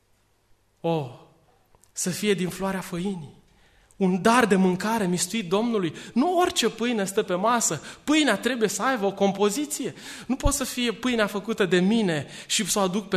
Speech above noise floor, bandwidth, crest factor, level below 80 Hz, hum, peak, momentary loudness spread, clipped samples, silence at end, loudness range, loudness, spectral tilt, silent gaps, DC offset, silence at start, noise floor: 41 dB; 13.5 kHz; 18 dB; -44 dBFS; none; -6 dBFS; 10 LU; under 0.1%; 0 s; 7 LU; -24 LUFS; -4 dB/octave; none; under 0.1%; 0.85 s; -65 dBFS